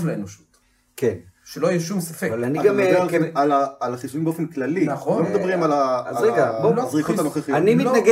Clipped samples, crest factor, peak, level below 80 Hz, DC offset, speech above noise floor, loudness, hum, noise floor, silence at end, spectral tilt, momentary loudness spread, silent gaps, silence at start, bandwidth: under 0.1%; 16 dB; -4 dBFS; -64 dBFS; under 0.1%; 38 dB; -21 LUFS; none; -58 dBFS; 0 s; -6.5 dB/octave; 9 LU; none; 0 s; 16 kHz